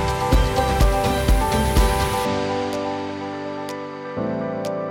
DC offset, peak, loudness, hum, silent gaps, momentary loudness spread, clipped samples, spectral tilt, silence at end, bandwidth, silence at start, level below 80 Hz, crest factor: under 0.1%; -6 dBFS; -22 LUFS; none; none; 10 LU; under 0.1%; -5.5 dB/octave; 0 s; 17.5 kHz; 0 s; -24 dBFS; 14 dB